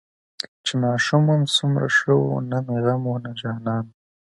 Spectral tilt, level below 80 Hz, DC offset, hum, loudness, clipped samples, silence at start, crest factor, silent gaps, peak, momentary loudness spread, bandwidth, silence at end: -5.5 dB/octave; -64 dBFS; under 0.1%; none; -21 LUFS; under 0.1%; 0.4 s; 18 dB; 0.48-0.64 s; -4 dBFS; 11 LU; 11.5 kHz; 0.45 s